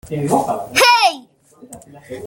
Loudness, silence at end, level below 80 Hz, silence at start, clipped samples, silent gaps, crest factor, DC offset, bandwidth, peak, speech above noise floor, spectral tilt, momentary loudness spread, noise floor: -14 LUFS; 0 s; -54 dBFS; 0.05 s; under 0.1%; none; 18 dB; under 0.1%; 17 kHz; 0 dBFS; 23 dB; -3 dB/octave; 20 LU; -40 dBFS